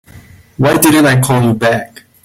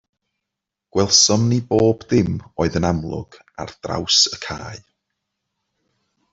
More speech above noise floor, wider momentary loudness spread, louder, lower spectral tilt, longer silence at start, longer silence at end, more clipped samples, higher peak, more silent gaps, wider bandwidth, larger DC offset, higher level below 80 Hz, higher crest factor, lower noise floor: second, 28 dB vs 64 dB; second, 9 LU vs 19 LU; first, -11 LUFS vs -17 LUFS; first, -5 dB/octave vs -3.5 dB/octave; second, 0.15 s vs 0.95 s; second, 0.4 s vs 1.55 s; neither; about the same, 0 dBFS vs -2 dBFS; neither; first, 16.5 kHz vs 8 kHz; neither; about the same, -44 dBFS vs -48 dBFS; second, 12 dB vs 20 dB; second, -38 dBFS vs -83 dBFS